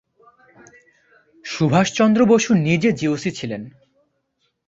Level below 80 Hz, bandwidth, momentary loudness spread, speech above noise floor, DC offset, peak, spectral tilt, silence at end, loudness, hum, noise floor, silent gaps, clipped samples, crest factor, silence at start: -58 dBFS; 7.8 kHz; 17 LU; 53 dB; under 0.1%; -2 dBFS; -5.5 dB/octave; 1 s; -18 LUFS; none; -70 dBFS; none; under 0.1%; 18 dB; 1.45 s